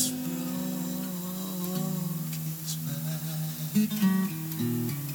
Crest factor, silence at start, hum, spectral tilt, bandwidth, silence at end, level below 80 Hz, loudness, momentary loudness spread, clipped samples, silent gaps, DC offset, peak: 18 dB; 0 s; none; -5 dB/octave; over 20 kHz; 0 s; -68 dBFS; -31 LUFS; 7 LU; under 0.1%; none; under 0.1%; -12 dBFS